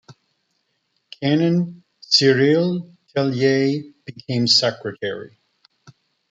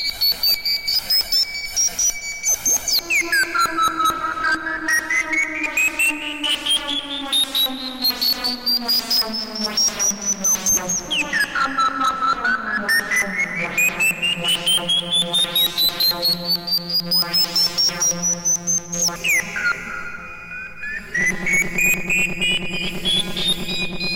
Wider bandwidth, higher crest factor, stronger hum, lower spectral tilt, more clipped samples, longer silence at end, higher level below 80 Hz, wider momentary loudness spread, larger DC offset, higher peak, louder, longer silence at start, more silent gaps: second, 9.4 kHz vs 17 kHz; first, 20 dB vs 12 dB; neither; first, -5 dB/octave vs 0 dB/octave; neither; first, 1.05 s vs 0 s; second, -66 dBFS vs -46 dBFS; first, 14 LU vs 6 LU; second, under 0.1% vs 0.4%; first, -2 dBFS vs -8 dBFS; about the same, -19 LUFS vs -18 LUFS; about the same, 0.1 s vs 0 s; neither